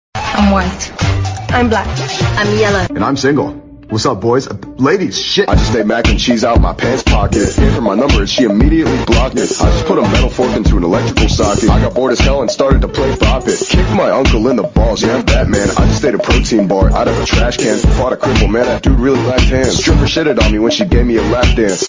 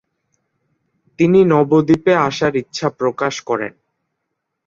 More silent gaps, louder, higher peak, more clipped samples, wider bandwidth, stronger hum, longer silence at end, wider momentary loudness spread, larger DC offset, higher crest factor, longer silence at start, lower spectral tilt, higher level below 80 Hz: neither; first, -12 LUFS vs -16 LUFS; about the same, 0 dBFS vs -2 dBFS; neither; about the same, 7.6 kHz vs 7.6 kHz; neither; second, 0 s vs 1 s; second, 4 LU vs 10 LU; neither; about the same, 12 dB vs 16 dB; second, 0.15 s vs 1.2 s; about the same, -5.5 dB/octave vs -6.5 dB/octave; first, -18 dBFS vs -56 dBFS